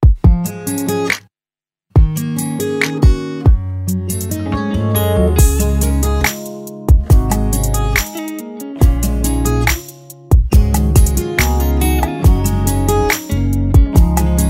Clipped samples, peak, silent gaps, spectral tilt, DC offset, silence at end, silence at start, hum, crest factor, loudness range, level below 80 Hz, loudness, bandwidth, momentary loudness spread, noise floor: under 0.1%; 0 dBFS; none; -5.5 dB/octave; under 0.1%; 0 s; 0 s; none; 14 dB; 2 LU; -16 dBFS; -15 LUFS; 16.5 kHz; 8 LU; under -90 dBFS